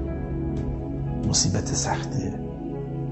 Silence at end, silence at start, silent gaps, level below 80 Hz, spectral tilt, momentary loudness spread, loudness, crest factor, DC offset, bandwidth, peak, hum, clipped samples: 0 s; 0 s; none; -36 dBFS; -4.5 dB/octave; 10 LU; -26 LUFS; 18 dB; under 0.1%; 8.6 kHz; -8 dBFS; none; under 0.1%